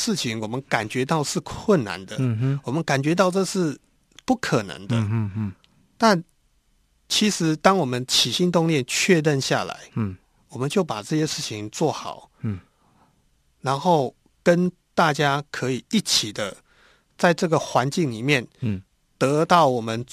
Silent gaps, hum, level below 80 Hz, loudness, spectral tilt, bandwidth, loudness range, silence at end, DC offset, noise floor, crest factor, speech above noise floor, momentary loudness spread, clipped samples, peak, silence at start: none; none; -58 dBFS; -22 LUFS; -4.5 dB/octave; 14 kHz; 6 LU; 0.1 s; under 0.1%; -64 dBFS; 24 dB; 42 dB; 12 LU; under 0.1%; 0 dBFS; 0 s